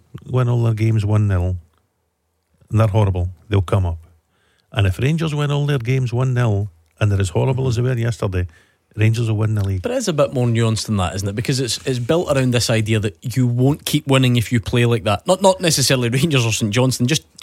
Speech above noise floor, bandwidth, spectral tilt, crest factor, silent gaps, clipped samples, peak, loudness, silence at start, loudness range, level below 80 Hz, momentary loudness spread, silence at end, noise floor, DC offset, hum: 51 dB; 16 kHz; -5.5 dB/octave; 16 dB; none; under 0.1%; -2 dBFS; -18 LUFS; 0.15 s; 4 LU; -42 dBFS; 7 LU; 0.25 s; -69 dBFS; under 0.1%; none